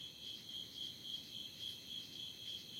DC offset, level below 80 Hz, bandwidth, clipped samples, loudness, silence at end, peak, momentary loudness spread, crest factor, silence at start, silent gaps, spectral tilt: under 0.1%; -80 dBFS; 16.5 kHz; under 0.1%; -46 LUFS; 0 s; -34 dBFS; 3 LU; 16 dB; 0 s; none; -1.5 dB/octave